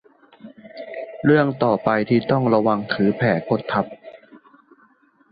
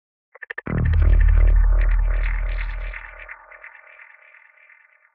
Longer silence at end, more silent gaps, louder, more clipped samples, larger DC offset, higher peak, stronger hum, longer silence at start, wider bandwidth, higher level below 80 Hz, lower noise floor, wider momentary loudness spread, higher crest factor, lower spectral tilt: second, 0.95 s vs 1.45 s; neither; about the same, -20 LUFS vs -22 LUFS; neither; neither; about the same, -4 dBFS vs -6 dBFS; neither; second, 0.45 s vs 0.65 s; first, 5 kHz vs 3.7 kHz; second, -58 dBFS vs -20 dBFS; about the same, -57 dBFS vs -54 dBFS; second, 17 LU vs 23 LU; about the same, 18 dB vs 14 dB; first, -11 dB/octave vs -7.5 dB/octave